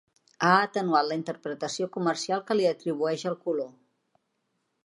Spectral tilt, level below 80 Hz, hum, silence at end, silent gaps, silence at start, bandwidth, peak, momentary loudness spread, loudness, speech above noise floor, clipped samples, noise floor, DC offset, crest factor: -4.5 dB/octave; -80 dBFS; none; 1.15 s; none; 0.4 s; 11.5 kHz; -6 dBFS; 10 LU; -27 LUFS; 50 dB; under 0.1%; -77 dBFS; under 0.1%; 22 dB